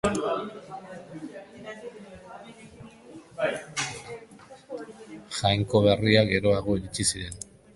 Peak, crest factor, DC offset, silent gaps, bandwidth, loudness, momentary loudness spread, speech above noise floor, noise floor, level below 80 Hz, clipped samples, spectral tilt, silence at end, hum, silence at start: -4 dBFS; 24 dB; under 0.1%; none; 11.5 kHz; -25 LUFS; 24 LU; 25 dB; -49 dBFS; -50 dBFS; under 0.1%; -4.5 dB/octave; 0.3 s; none; 0.05 s